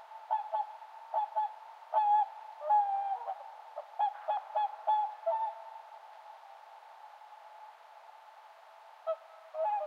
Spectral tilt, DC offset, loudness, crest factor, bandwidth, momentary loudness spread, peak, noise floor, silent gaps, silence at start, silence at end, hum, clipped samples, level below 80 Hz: 2 dB/octave; under 0.1%; -34 LUFS; 18 dB; 6.4 kHz; 24 LU; -18 dBFS; -56 dBFS; none; 0 s; 0 s; none; under 0.1%; under -90 dBFS